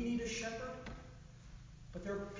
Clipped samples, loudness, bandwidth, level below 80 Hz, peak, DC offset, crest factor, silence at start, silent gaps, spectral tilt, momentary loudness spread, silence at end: under 0.1%; -43 LUFS; 7.6 kHz; -56 dBFS; -30 dBFS; under 0.1%; 14 dB; 0 s; none; -4.5 dB/octave; 18 LU; 0 s